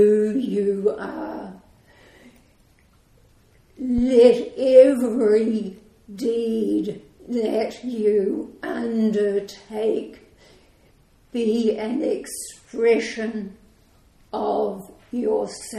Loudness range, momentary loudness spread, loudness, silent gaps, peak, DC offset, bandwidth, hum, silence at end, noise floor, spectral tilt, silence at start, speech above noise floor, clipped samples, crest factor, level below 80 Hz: 8 LU; 18 LU; -21 LUFS; none; -2 dBFS; under 0.1%; 14 kHz; none; 0 s; -57 dBFS; -6 dB/octave; 0 s; 36 dB; under 0.1%; 20 dB; -52 dBFS